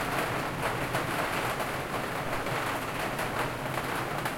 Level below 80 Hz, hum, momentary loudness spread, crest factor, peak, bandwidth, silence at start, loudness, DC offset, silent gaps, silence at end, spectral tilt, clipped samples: -50 dBFS; none; 2 LU; 16 dB; -16 dBFS; 17 kHz; 0 s; -31 LUFS; under 0.1%; none; 0 s; -4 dB/octave; under 0.1%